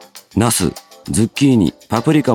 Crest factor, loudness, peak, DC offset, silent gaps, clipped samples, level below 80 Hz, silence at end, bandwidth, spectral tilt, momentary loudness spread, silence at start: 14 dB; -16 LUFS; 0 dBFS; under 0.1%; none; under 0.1%; -42 dBFS; 0 s; 18 kHz; -5 dB/octave; 9 LU; 0.15 s